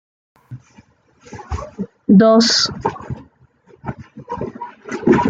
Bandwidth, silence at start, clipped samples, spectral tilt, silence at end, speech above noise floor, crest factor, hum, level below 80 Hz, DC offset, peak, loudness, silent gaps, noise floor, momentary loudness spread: 9 kHz; 0.5 s; under 0.1%; -5 dB/octave; 0 s; 36 dB; 16 dB; none; -42 dBFS; under 0.1%; -2 dBFS; -15 LUFS; none; -51 dBFS; 26 LU